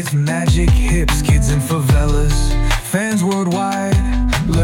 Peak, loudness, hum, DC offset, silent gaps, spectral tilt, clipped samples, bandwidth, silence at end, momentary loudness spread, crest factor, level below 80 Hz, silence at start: -4 dBFS; -16 LUFS; none; under 0.1%; none; -5.5 dB/octave; under 0.1%; 17 kHz; 0 s; 3 LU; 10 dB; -18 dBFS; 0 s